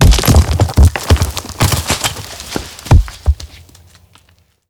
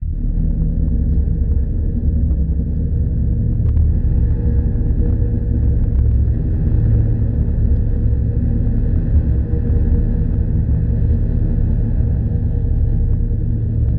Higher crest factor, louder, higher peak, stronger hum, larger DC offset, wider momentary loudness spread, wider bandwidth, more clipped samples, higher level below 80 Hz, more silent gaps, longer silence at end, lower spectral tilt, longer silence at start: about the same, 12 dB vs 10 dB; first, -14 LUFS vs -18 LUFS; first, 0 dBFS vs -4 dBFS; neither; neither; first, 13 LU vs 3 LU; first, 19.5 kHz vs 2 kHz; neither; about the same, -16 dBFS vs -18 dBFS; neither; first, 1.25 s vs 0 s; second, -4.5 dB/octave vs -14.5 dB/octave; about the same, 0 s vs 0 s